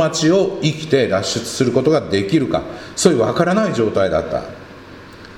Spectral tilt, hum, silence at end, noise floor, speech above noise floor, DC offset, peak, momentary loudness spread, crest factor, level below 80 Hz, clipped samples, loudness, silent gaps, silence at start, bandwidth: -5 dB/octave; none; 0 s; -38 dBFS; 21 dB; under 0.1%; 0 dBFS; 14 LU; 18 dB; -46 dBFS; under 0.1%; -17 LUFS; none; 0 s; 16 kHz